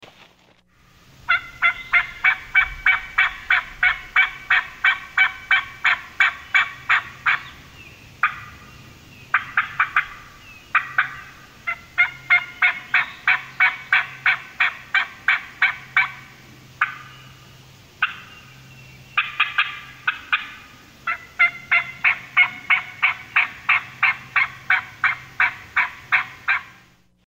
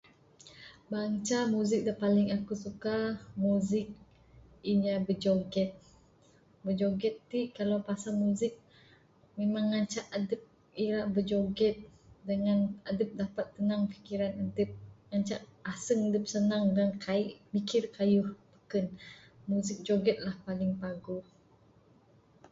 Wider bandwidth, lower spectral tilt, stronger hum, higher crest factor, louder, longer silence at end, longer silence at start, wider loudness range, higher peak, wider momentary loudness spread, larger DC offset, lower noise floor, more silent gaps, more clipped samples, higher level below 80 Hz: first, 16 kHz vs 8 kHz; second, -1.5 dB/octave vs -6 dB/octave; neither; about the same, 18 dB vs 16 dB; first, -20 LUFS vs -32 LUFS; second, 0.65 s vs 1.3 s; first, 1.3 s vs 0.45 s; first, 6 LU vs 3 LU; first, -6 dBFS vs -16 dBFS; second, 8 LU vs 11 LU; neither; second, -56 dBFS vs -63 dBFS; neither; neither; first, -54 dBFS vs -64 dBFS